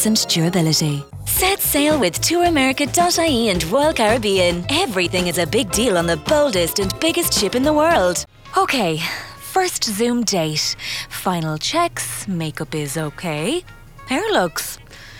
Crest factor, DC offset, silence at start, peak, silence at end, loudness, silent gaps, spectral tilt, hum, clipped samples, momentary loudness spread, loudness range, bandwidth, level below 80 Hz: 16 dB; under 0.1%; 0 s; -2 dBFS; 0 s; -18 LUFS; none; -3.5 dB/octave; none; under 0.1%; 9 LU; 6 LU; 18.5 kHz; -40 dBFS